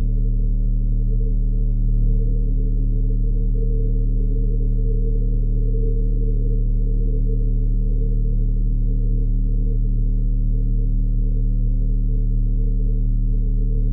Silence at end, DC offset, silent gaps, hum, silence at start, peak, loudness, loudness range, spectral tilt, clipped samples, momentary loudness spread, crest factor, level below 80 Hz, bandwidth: 0 s; under 0.1%; none; none; 0 s; -8 dBFS; -23 LUFS; 0 LU; -14 dB/octave; under 0.1%; 0 LU; 8 dB; -18 dBFS; 0.6 kHz